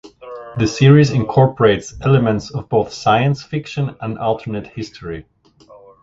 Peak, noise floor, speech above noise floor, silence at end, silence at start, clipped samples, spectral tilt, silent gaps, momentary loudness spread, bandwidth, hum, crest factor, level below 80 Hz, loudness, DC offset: 0 dBFS; -46 dBFS; 30 dB; 0.8 s; 0.05 s; under 0.1%; -7 dB/octave; none; 18 LU; 7.8 kHz; none; 16 dB; -44 dBFS; -16 LUFS; under 0.1%